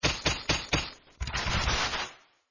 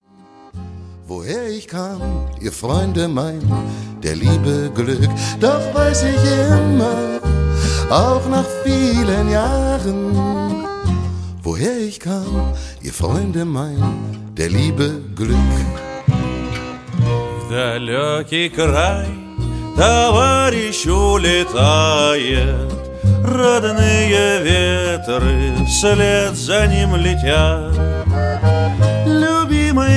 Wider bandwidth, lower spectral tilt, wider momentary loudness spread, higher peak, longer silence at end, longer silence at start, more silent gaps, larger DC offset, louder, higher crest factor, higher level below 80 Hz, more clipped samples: second, 7.4 kHz vs 11 kHz; second, -3 dB/octave vs -5.5 dB/octave; about the same, 12 LU vs 11 LU; second, -12 dBFS vs 0 dBFS; first, 0.35 s vs 0 s; second, 0.05 s vs 0.45 s; neither; neither; second, -29 LUFS vs -17 LUFS; about the same, 20 dB vs 16 dB; second, -40 dBFS vs -24 dBFS; neither